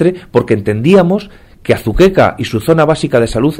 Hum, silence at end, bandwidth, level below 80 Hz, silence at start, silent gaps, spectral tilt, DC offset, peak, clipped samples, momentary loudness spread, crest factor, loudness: none; 0 s; 16.5 kHz; -30 dBFS; 0 s; none; -7 dB/octave; under 0.1%; 0 dBFS; 0.2%; 7 LU; 12 dB; -11 LUFS